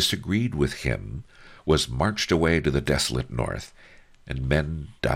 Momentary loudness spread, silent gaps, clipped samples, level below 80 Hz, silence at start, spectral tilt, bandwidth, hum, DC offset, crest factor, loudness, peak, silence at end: 13 LU; none; under 0.1%; -38 dBFS; 0 s; -5 dB/octave; 16.5 kHz; none; under 0.1%; 18 dB; -25 LUFS; -8 dBFS; 0 s